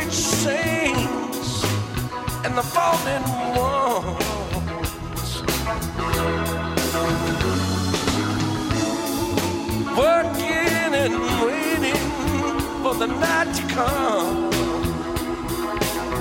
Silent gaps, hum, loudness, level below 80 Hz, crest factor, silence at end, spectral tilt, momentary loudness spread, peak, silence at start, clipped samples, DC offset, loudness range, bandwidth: none; none; -22 LUFS; -36 dBFS; 18 dB; 0 s; -4.5 dB/octave; 6 LU; -4 dBFS; 0 s; under 0.1%; under 0.1%; 3 LU; 16.5 kHz